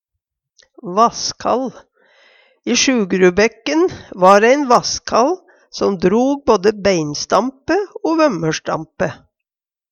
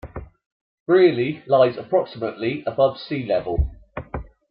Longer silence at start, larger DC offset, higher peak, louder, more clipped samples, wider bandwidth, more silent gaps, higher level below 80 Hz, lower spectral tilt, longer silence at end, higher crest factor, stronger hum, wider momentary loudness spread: first, 0.85 s vs 0.05 s; neither; first, 0 dBFS vs -4 dBFS; first, -16 LUFS vs -21 LUFS; neither; first, 10 kHz vs 5.4 kHz; second, none vs 0.46-0.86 s; second, -50 dBFS vs -36 dBFS; second, -4 dB/octave vs -10.5 dB/octave; first, 0.75 s vs 0.25 s; about the same, 16 dB vs 18 dB; neither; second, 11 LU vs 19 LU